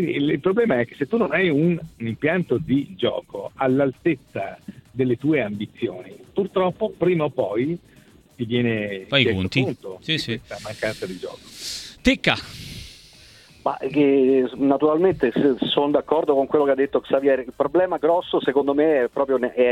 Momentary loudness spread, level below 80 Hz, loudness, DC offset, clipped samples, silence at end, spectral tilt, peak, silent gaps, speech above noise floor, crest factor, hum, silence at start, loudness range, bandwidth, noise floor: 12 LU; -50 dBFS; -22 LUFS; under 0.1%; under 0.1%; 0 s; -6 dB/octave; -2 dBFS; none; 27 dB; 20 dB; none; 0 s; 5 LU; 14 kHz; -49 dBFS